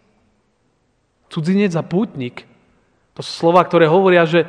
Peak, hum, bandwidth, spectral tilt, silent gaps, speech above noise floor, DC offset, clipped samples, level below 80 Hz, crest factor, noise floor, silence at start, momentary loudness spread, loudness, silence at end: 0 dBFS; none; 10 kHz; -7 dB/octave; none; 49 dB; under 0.1%; under 0.1%; -64 dBFS; 18 dB; -63 dBFS; 1.3 s; 17 LU; -15 LUFS; 0 s